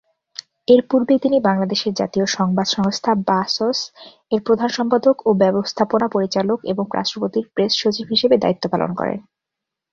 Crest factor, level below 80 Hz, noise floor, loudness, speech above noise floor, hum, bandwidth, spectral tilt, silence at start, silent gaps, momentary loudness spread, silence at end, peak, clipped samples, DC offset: 16 dB; -58 dBFS; -83 dBFS; -18 LUFS; 65 dB; none; 7.6 kHz; -5 dB/octave; 0.7 s; none; 8 LU; 0.7 s; -2 dBFS; under 0.1%; under 0.1%